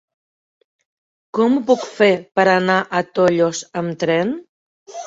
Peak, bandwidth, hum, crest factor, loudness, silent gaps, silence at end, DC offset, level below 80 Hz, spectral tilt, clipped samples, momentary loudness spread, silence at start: -2 dBFS; 8 kHz; none; 18 dB; -17 LUFS; 4.49-4.86 s; 0 s; under 0.1%; -62 dBFS; -5 dB/octave; under 0.1%; 10 LU; 1.35 s